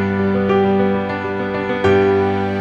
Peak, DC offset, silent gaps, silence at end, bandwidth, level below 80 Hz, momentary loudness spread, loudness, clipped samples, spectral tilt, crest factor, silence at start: -4 dBFS; under 0.1%; none; 0 s; 7.8 kHz; -48 dBFS; 7 LU; -17 LUFS; under 0.1%; -8 dB/octave; 12 dB; 0 s